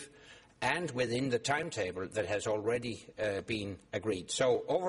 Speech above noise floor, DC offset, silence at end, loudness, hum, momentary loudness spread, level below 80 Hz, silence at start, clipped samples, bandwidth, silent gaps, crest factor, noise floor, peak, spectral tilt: 24 dB; under 0.1%; 0 s; -34 LUFS; none; 7 LU; -64 dBFS; 0 s; under 0.1%; 11.5 kHz; none; 20 dB; -57 dBFS; -14 dBFS; -4 dB/octave